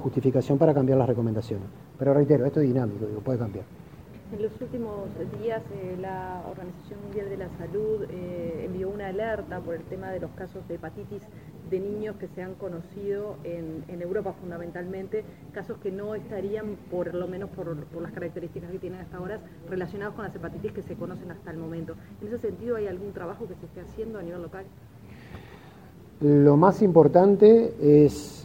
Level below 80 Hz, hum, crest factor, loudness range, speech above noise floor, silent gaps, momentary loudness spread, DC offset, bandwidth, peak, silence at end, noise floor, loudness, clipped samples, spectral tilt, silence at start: -54 dBFS; none; 24 dB; 13 LU; 22 dB; none; 21 LU; under 0.1%; 16 kHz; -2 dBFS; 0 s; -48 dBFS; -26 LUFS; under 0.1%; -9 dB/octave; 0 s